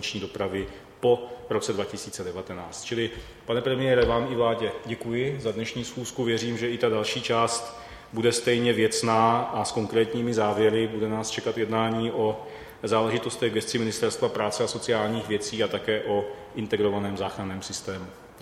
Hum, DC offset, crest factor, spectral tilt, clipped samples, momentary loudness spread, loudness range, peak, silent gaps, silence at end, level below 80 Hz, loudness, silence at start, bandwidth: none; under 0.1%; 20 dB; -4.5 dB/octave; under 0.1%; 11 LU; 4 LU; -6 dBFS; none; 0 s; -52 dBFS; -27 LUFS; 0 s; 15 kHz